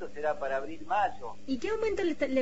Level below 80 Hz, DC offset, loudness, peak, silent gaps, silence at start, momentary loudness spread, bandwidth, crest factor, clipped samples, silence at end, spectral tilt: -56 dBFS; 1%; -32 LUFS; -16 dBFS; none; 0 s; 6 LU; 8 kHz; 16 dB; under 0.1%; 0 s; -5 dB/octave